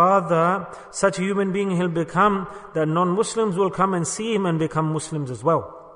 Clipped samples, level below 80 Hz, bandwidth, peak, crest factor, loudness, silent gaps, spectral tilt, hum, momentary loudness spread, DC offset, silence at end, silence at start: under 0.1%; -56 dBFS; 10.5 kHz; -6 dBFS; 16 dB; -22 LUFS; none; -5.5 dB/octave; none; 7 LU; under 0.1%; 0 s; 0 s